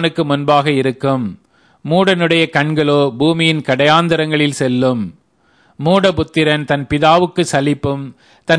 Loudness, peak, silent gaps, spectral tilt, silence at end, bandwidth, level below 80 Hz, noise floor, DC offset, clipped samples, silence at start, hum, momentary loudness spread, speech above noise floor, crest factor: -14 LUFS; 0 dBFS; none; -5.5 dB/octave; 0 s; 11 kHz; -46 dBFS; -55 dBFS; under 0.1%; under 0.1%; 0 s; none; 10 LU; 41 dB; 14 dB